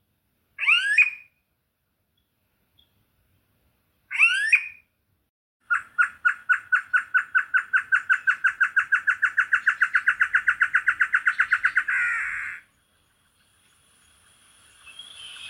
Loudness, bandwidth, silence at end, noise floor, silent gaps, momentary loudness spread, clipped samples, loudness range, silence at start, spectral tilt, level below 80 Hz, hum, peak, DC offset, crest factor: -21 LUFS; 12.5 kHz; 0 s; -74 dBFS; 5.29-5.60 s; 12 LU; under 0.1%; 6 LU; 0.6 s; 2 dB/octave; -70 dBFS; none; -6 dBFS; under 0.1%; 20 dB